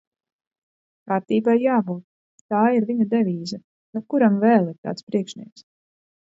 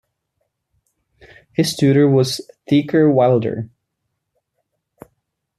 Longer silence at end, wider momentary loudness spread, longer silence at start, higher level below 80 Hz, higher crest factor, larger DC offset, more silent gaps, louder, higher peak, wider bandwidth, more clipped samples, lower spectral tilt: second, 0.85 s vs 1.95 s; about the same, 16 LU vs 14 LU; second, 1.05 s vs 1.6 s; second, -72 dBFS vs -60 dBFS; about the same, 20 dB vs 16 dB; neither; first, 2.04-2.49 s, 3.64-3.93 s, 4.78-4.83 s, 5.03-5.07 s vs none; second, -21 LUFS vs -16 LUFS; about the same, -4 dBFS vs -4 dBFS; second, 7.8 kHz vs 14 kHz; neither; about the same, -7.5 dB/octave vs -6.5 dB/octave